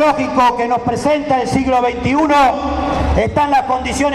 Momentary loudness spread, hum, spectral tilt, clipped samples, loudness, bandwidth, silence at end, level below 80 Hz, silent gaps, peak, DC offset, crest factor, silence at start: 5 LU; none; -5.5 dB/octave; under 0.1%; -15 LUFS; 14.5 kHz; 0 s; -28 dBFS; none; 0 dBFS; under 0.1%; 14 dB; 0 s